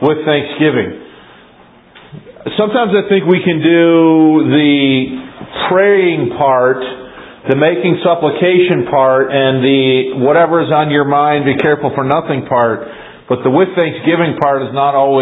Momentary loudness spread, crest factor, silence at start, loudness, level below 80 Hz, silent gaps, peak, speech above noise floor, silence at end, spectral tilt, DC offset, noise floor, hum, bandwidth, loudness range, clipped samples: 10 LU; 12 dB; 0 s; -12 LUFS; -52 dBFS; none; 0 dBFS; 32 dB; 0 s; -9.5 dB/octave; under 0.1%; -43 dBFS; none; 4 kHz; 3 LU; under 0.1%